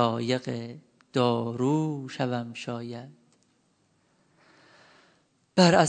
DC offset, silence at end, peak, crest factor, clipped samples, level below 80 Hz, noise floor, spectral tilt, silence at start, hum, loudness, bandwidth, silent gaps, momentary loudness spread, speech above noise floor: under 0.1%; 0 s; -4 dBFS; 24 dB; under 0.1%; -70 dBFS; -68 dBFS; -5.5 dB/octave; 0 s; none; -28 LUFS; 9.4 kHz; none; 17 LU; 43 dB